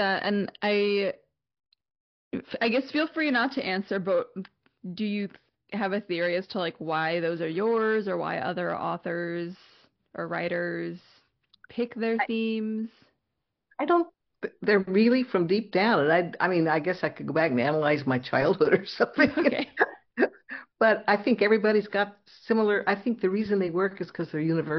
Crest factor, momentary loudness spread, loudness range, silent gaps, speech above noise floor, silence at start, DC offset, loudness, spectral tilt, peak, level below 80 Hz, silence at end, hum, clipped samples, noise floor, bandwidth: 20 dB; 13 LU; 7 LU; 2.00-2.31 s; 56 dB; 0 s; under 0.1%; -26 LUFS; -4 dB/octave; -6 dBFS; -68 dBFS; 0 s; none; under 0.1%; -82 dBFS; 6.2 kHz